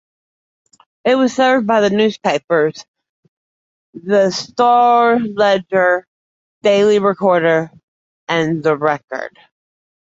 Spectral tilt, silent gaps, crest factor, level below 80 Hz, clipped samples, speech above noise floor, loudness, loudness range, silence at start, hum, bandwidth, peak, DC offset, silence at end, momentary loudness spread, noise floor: -5 dB/octave; 2.44-2.48 s, 2.88-2.94 s, 3.09-3.93 s, 6.07-6.61 s, 7.83-8.27 s, 9.04-9.08 s; 14 dB; -62 dBFS; under 0.1%; over 76 dB; -15 LUFS; 3 LU; 1.05 s; none; 7.8 kHz; -2 dBFS; under 0.1%; 0.8 s; 10 LU; under -90 dBFS